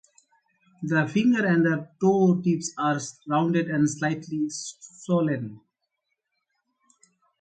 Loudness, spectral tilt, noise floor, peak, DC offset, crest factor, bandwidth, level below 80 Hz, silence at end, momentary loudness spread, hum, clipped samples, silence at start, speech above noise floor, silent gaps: -24 LUFS; -6 dB/octave; -79 dBFS; -10 dBFS; under 0.1%; 16 dB; 9.4 kHz; -70 dBFS; 1.8 s; 11 LU; none; under 0.1%; 0.8 s; 55 dB; none